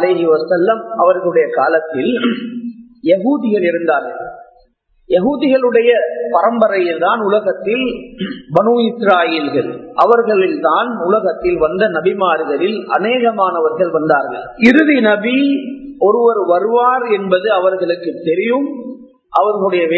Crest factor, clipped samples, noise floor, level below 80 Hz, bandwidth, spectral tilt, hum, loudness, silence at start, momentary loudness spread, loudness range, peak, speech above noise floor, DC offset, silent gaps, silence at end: 14 dB; under 0.1%; -54 dBFS; -52 dBFS; 7 kHz; -7.5 dB/octave; none; -14 LUFS; 0 s; 8 LU; 3 LU; 0 dBFS; 40 dB; under 0.1%; none; 0 s